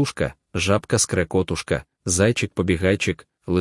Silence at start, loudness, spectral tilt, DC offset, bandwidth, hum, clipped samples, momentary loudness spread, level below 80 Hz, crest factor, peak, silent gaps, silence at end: 0 s; -22 LUFS; -4.5 dB/octave; under 0.1%; 12 kHz; none; under 0.1%; 7 LU; -46 dBFS; 18 dB; -4 dBFS; none; 0 s